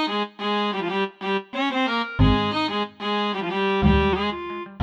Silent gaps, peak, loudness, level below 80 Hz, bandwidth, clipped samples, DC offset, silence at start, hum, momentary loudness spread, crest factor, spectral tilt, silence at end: none; -6 dBFS; -23 LUFS; -34 dBFS; 8.6 kHz; under 0.1%; under 0.1%; 0 s; none; 7 LU; 18 dB; -7 dB/octave; 0 s